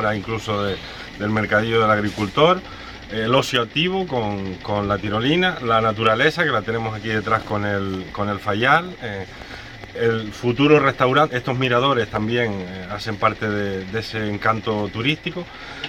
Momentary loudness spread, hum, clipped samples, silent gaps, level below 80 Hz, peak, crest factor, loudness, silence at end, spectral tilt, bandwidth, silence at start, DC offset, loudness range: 13 LU; none; under 0.1%; none; -46 dBFS; -2 dBFS; 18 dB; -20 LUFS; 0 s; -6 dB/octave; 14 kHz; 0 s; under 0.1%; 4 LU